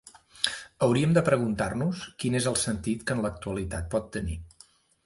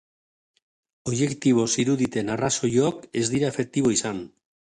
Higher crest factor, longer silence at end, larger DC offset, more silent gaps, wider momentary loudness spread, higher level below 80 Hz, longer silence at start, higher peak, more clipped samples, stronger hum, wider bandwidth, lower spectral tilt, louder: first, 24 dB vs 16 dB; about the same, 0.55 s vs 0.5 s; neither; neither; about the same, 11 LU vs 9 LU; first, -46 dBFS vs -58 dBFS; second, 0.35 s vs 1.05 s; first, -4 dBFS vs -8 dBFS; neither; neither; about the same, 11.5 kHz vs 11 kHz; about the same, -5 dB/octave vs -4.5 dB/octave; second, -28 LUFS vs -24 LUFS